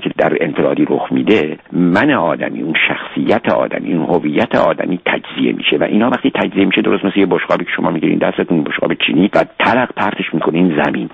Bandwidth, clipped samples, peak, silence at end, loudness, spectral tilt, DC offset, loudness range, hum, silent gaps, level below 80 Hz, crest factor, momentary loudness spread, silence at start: 7.4 kHz; under 0.1%; 0 dBFS; 0.05 s; -14 LUFS; -7.5 dB/octave; under 0.1%; 1 LU; none; none; -50 dBFS; 14 dB; 4 LU; 0 s